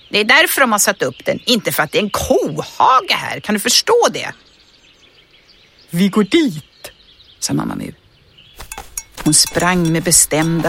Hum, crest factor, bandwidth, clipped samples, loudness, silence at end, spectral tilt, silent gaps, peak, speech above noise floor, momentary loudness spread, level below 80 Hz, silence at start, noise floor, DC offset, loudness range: none; 16 dB; 17 kHz; under 0.1%; -14 LUFS; 0 s; -3 dB/octave; none; 0 dBFS; 34 dB; 17 LU; -44 dBFS; 0.1 s; -49 dBFS; under 0.1%; 6 LU